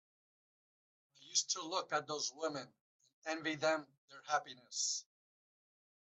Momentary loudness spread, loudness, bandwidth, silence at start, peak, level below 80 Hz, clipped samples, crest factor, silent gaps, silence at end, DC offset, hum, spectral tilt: 13 LU; -39 LUFS; 8.4 kHz; 1.2 s; -20 dBFS; under -90 dBFS; under 0.1%; 22 dB; 2.81-3.00 s, 3.13-3.22 s, 3.98-4.08 s; 1.1 s; under 0.1%; none; -1 dB/octave